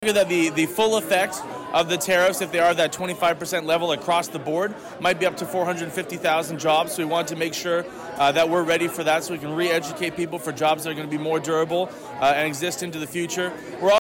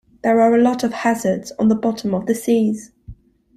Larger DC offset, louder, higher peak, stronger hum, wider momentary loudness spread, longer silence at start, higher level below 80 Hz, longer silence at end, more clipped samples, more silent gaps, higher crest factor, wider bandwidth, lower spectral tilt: neither; second, -23 LUFS vs -18 LUFS; second, -12 dBFS vs -4 dBFS; neither; about the same, 8 LU vs 8 LU; second, 0 s vs 0.25 s; second, -62 dBFS vs -52 dBFS; second, 0 s vs 0.45 s; neither; neither; about the same, 12 dB vs 14 dB; first, 19 kHz vs 14.5 kHz; second, -3.5 dB/octave vs -6 dB/octave